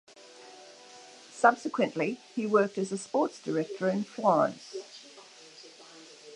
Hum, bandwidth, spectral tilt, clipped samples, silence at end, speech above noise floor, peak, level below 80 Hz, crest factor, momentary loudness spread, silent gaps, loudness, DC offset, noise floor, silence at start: none; 11.5 kHz; -5.5 dB/octave; under 0.1%; 0 s; 24 dB; -8 dBFS; -84 dBFS; 24 dB; 24 LU; none; -29 LUFS; under 0.1%; -52 dBFS; 0.4 s